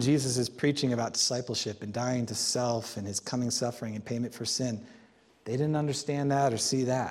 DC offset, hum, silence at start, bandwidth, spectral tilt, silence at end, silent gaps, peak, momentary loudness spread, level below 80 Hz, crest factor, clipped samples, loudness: under 0.1%; none; 0 s; 15.5 kHz; -4.5 dB/octave; 0 s; none; -14 dBFS; 8 LU; -68 dBFS; 16 dB; under 0.1%; -30 LUFS